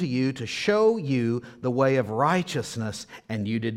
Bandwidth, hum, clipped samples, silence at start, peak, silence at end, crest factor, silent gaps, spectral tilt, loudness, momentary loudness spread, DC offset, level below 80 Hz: 15 kHz; none; under 0.1%; 0 s; -8 dBFS; 0 s; 16 dB; none; -6 dB/octave; -25 LUFS; 10 LU; under 0.1%; -62 dBFS